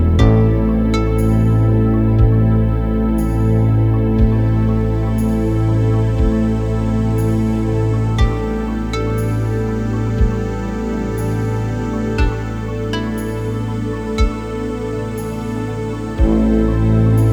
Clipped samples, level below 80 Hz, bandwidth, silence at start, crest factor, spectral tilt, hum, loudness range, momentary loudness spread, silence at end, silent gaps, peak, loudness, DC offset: under 0.1%; -22 dBFS; 12 kHz; 0 s; 16 dB; -8.5 dB/octave; none; 6 LU; 9 LU; 0 s; none; 0 dBFS; -17 LUFS; under 0.1%